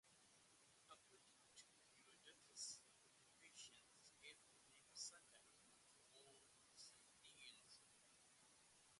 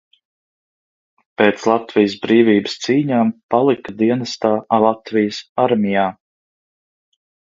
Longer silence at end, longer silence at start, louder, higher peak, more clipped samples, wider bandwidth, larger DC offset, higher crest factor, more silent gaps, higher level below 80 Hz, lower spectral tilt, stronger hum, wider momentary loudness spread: second, 0 s vs 1.35 s; second, 0.05 s vs 1.4 s; second, -62 LUFS vs -17 LUFS; second, -42 dBFS vs 0 dBFS; neither; first, 11.5 kHz vs 7.6 kHz; neither; first, 26 dB vs 18 dB; second, none vs 3.43-3.49 s, 5.49-5.56 s; second, under -90 dBFS vs -60 dBFS; second, 0.5 dB/octave vs -6 dB/octave; neither; first, 14 LU vs 5 LU